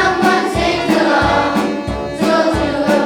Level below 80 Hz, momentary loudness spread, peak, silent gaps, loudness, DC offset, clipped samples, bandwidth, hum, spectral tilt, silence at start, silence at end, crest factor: -32 dBFS; 6 LU; 0 dBFS; none; -15 LUFS; under 0.1%; under 0.1%; 19 kHz; none; -5 dB/octave; 0 s; 0 s; 14 dB